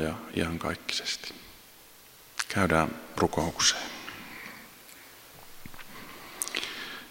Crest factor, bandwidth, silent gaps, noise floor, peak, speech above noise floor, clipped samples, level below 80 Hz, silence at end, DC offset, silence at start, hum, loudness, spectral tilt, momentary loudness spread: 26 dB; 16.5 kHz; none; -53 dBFS; -6 dBFS; 24 dB; under 0.1%; -52 dBFS; 0 s; under 0.1%; 0 s; none; -30 LUFS; -3 dB/octave; 24 LU